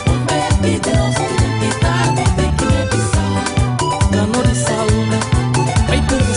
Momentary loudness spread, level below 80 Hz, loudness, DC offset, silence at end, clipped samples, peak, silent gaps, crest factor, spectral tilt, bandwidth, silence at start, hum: 2 LU; -24 dBFS; -16 LUFS; under 0.1%; 0 s; under 0.1%; -4 dBFS; none; 12 dB; -5 dB/octave; 11 kHz; 0 s; none